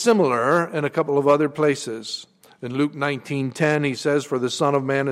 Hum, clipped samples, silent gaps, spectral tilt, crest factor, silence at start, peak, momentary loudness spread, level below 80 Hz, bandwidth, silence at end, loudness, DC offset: none; under 0.1%; none; -5.5 dB/octave; 16 dB; 0 s; -6 dBFS; 11 LU; -68 dBFS; 14 kHz; 0 s; -21 LUFS; under 0.1%